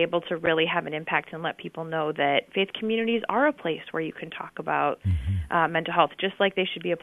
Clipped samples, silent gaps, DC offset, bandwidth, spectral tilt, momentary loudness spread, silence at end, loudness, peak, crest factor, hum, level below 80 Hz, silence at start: under 0.1%; none; under 0.1%; 11 kHz; -7.5 dB/octave; 9 LU; 0.05 s; -26 LUFS; -4 dBFS; 22 dB; none; -46 dBFS; 0 s